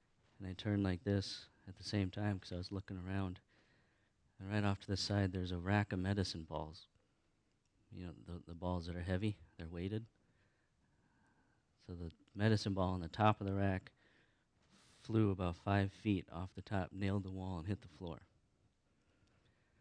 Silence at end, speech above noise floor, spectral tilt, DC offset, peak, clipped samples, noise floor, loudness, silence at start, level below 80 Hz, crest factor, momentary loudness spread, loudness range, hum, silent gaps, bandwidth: 1.55 s; 39 dB; -6.5 dB/octave; under 0.1%; -16 dBFS; under 0.1%; -79 dBFS; -40 LUFS; 0.4 s; -64 dBFS; 24 dB; 15 LU; 7 LU; none; none; 10 kHz